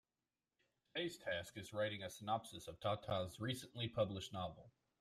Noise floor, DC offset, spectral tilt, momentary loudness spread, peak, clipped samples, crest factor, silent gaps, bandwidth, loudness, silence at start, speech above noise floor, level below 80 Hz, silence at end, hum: under -90 dBFS; under 0.1%; -5 dB/octave; 8 LU; -26 dBFS; under 0.1%; 20 dB; none; 15.5 kHz; -45 LUFS; 0.95 s; over 46 dB; -74 dBFS; 0.3 s; none